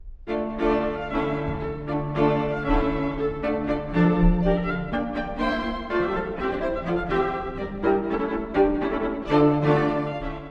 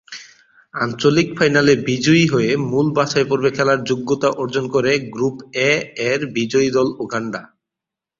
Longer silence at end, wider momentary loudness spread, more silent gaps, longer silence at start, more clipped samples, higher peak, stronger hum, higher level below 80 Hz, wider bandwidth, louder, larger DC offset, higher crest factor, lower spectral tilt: second, 0 s vs 0.75 s; about the same, 8 LU vs 10 LU; neither; about the same, 0 s vs 0.1 s; neither; second, -8 dBFS vs -2 dBFS; neither; first, -34 dBFS vs -54 dBFS; second, 6.8 kHz vs 7.6 kHz; second, -25 LUFS vs -17 LUFS; neither; about the same, 16 dB vs 16 dB; first, -9 dB/octave vs -5 dB/octave